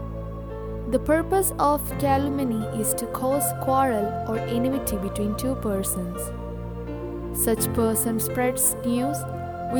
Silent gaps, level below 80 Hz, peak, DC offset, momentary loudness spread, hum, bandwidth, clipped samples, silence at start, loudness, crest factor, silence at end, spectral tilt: none; -40 dBFS; -8 dBFS; under 0.1%; 12 LU; none; over 20 kHz; under 0.1%; 0 s; -25 LUFS; 16 dB; 0 s; -5 dB/octave